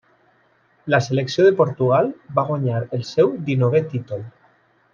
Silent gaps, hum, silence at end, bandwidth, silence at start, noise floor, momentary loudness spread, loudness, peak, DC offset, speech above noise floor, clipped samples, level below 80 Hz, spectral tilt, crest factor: none; none; 0.65 s; 7.4 kHz; 0.85 s; -60 dBFS; 13 LU; -19 LUFS; -2 dBFS; under 0.1%; 41 dB; under 0.1%; -62 dBFS; -7 dB/octave; 18 dB